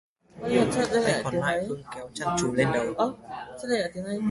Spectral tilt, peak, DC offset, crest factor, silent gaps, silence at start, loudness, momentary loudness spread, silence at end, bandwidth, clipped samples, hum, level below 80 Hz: -5 dB/octave; -8 dBFS; under 0.1%; 18 dB; none; 0.35 s; -27 LUFS; 13 LU; 0 s; 11.5 kHz; under 0.1%; none; -56 dBFS